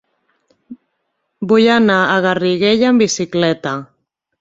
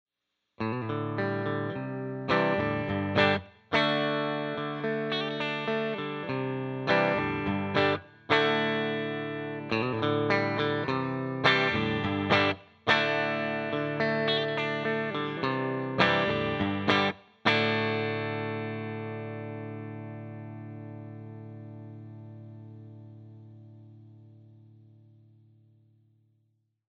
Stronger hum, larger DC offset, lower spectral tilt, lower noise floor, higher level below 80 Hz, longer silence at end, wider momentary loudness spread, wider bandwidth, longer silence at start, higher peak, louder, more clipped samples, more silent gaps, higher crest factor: neither; neither; second, -4.5 dB/octave vs -6.5 dB/octave; second, -70 dBFS vs -83 dBFS; first, -56 dBFS vs -62 dBFS; second, 0.55 s vs 2.2 s; second, 11 LU vs 18 LU; about the same, 7.8 kHz vs 8.2 kHz; about the same, 0.7 s vs 0.6 s; first, -2 dBFS vs -6 dBFS; first, -14 LUFS vs -28 LUFS; neither; neither; second, 14 dB vs 24 dB